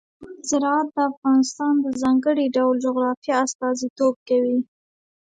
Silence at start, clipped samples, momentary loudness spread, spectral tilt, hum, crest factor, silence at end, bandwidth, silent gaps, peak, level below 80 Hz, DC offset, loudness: 0.2 s; under 0.1%; 5 LU; -3.5 dB/octave; none; 14 dB; 0.55 s; 9.2 kHz; 1.17-1.22 s, 3.17-3.22 s, 3.55-3.59 s, 3.90-3.96 s, 4.16-4.26 s; -8 dBFS; -66 dBFS; under 0.1%; -21 LUFS